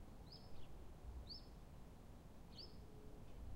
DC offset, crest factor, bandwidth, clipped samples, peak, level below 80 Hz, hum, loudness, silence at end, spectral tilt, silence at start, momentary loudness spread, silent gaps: under 0.1%; 14 dB; 16 kHz; under 0.1%; -42 dBFS; -60 dBFS; none; -59 LUFS; 0 s; -5.5 dB/octave; 0 s; 6 LU; none